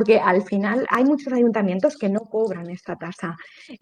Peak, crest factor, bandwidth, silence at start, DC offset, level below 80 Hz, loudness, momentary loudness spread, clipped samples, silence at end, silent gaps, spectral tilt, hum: -2 dBFS; 18 dB; 10 kHz; 0 s; under 0.1%; -68 dBFS; -21 LUFS; 14 LU; under 0.1%; 0.05 s; none; -7 dB/octave; none